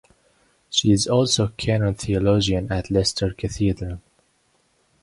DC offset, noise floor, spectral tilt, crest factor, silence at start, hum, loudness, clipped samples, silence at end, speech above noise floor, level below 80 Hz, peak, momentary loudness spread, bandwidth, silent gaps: under 0.1%; -65 dBFS; -5 dB/octave; 18 dB; 0.7 s; none; -21 LUFS; under 0.1%; 1.05 s; 44 dB; -40 dBFS; -6 dBFS; 8 LU; 11.5 kHz; none